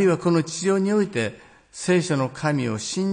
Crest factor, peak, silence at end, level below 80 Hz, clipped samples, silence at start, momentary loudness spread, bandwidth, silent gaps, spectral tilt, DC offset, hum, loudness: 14 dB; -8 dBFS; 0 s; -62 dBFS; under 0.1%; 0 s; 8 LU; 10.5 kHz; none; -5.5 dB/octave; under 0.1%; none; -23 LUFS